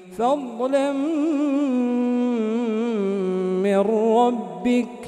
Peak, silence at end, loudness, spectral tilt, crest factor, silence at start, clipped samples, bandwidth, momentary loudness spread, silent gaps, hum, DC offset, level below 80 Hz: -8 dBFS; 0 s; -22 LUFS; -7 dB/octave; 14 dB; 0 s; under 0.1%; 10.5 kHz; 4 LU; none; none; under 0.1%; -66 dBFS